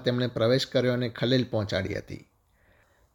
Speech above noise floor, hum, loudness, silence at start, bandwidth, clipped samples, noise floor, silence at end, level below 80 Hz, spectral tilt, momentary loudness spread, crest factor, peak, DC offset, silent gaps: 37 dB; none; -27 LUFS; 0 s; 17 kHz; under 0.1%; -64 dBFS; 0.95 s; -58 dBFS; -6 dB/octave; 12 LU; 20 dB; -8 dBFS; under 0.1%; none